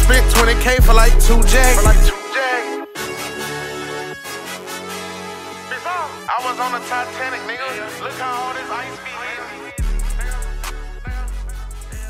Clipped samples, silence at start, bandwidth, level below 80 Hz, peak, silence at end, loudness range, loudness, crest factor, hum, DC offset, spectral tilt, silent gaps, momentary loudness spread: under 0.1%; 0 s; 16 kHz; -18 dBFS; 0 dBFS; 0 s; 11 LU; -19 LUFS; 16 dB; none; under 0.1%; -3.5 dB/octave; none; 16 LU